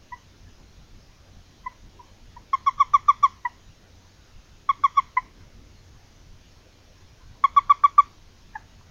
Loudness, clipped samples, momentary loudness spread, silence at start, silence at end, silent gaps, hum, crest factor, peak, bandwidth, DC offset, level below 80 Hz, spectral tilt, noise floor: -21 LUFS; under 0.1%; 26 LU; 0.1 s; 0.9 s; none; none; 24 dB; -2 dBFS; 7.2 kHz; under 0.1%; -54 dBFS; -2.5 dB/octave; -53 dBFS